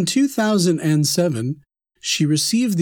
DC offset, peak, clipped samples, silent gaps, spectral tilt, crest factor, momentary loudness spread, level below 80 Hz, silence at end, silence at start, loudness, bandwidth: under 0.1%; -6 dBFS; under 0.1%; none; -4.5 dB/octave; 12 dB; 10 LU; -68 dBFS; 0 s; 0 s; -19 LUFS; over 20 kHz